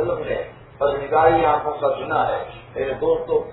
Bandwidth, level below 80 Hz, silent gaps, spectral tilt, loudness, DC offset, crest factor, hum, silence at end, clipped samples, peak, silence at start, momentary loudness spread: 4.1 kHz; -46 dBFS; none; -10 dB/octave; -21 LUFS; under 0.1%; 18 dB; none; 0 s; under 0.1%; -2 dBFS; 0 s; 12 LU